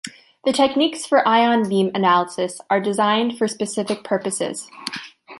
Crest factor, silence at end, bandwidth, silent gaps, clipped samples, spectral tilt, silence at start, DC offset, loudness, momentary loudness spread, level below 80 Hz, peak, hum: 16 dB; 0 s; 11.5 kHz; none; under 0.1%; -4 dB/octave; 0.05 s; under 0.1%; -20 LUFS; 14 LU; -66 dBFS; -4 dBFS; none